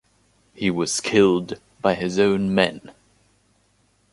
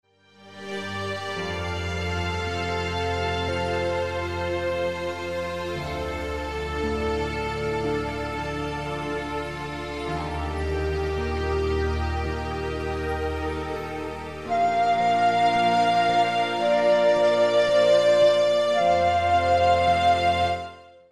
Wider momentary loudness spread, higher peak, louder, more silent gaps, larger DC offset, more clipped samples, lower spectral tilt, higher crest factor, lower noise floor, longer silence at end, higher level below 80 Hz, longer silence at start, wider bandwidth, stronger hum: about the same, 8 LU vs 10 LU; first, -2 dBFS vs -10 dBFS; first, -21 LUFS vs -24 LUFS; neither; second, under 0.1% vs 0.3%; neither; about the same, -4.5 dB/octave vs -5.5 dB/octave; first, 20 dB vs 14 dB; first, -63 dBFS vs -51 dBFS; first, 1.25 s vs 0.1 s; second, -54 dBFS vs -38 dBFS; first, 0.6 s vs 0.4 s; second, 11.5 kHz vs 13 kHz; first, 50 Hz at -40 dBFS vs none